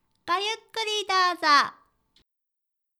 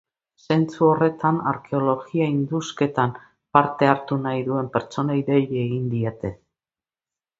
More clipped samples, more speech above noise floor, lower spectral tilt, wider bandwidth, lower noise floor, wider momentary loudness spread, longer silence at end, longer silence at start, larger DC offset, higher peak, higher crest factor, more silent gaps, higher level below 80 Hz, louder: neither; second, 59 dB vs over 69 dB; second, 0 dB/octave vs -7.5 dB/octave; first, 14.5 kHz vs 7.8 kHz; second, -83 dBFS vs under -90 dBFS; about the same, 9 LU vs 7 LU; first, 1.3 s vs 1.05 s; second, 0.25 s vs 0.5 s; neither; second, -6 dBFS vs 0 dBFS; about the same, 20 dB vs 22 dB; neither; second, -76 dBFS vs -58 dBFS; about the same, -24 LUFS vs -22 LUFS